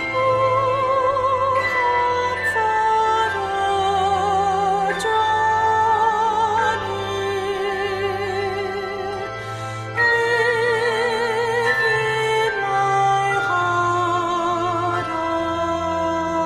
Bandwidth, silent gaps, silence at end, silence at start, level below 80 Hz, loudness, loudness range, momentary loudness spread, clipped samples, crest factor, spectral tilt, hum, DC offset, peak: 15.5 kHz; none; 0 s; 0 s; -50 dBFS; -20 LUFS; 3 LU; 6 LU; under 0.1%; 12 dB; -4.5 dB/octave; none; under 0.1%; -8 dBFS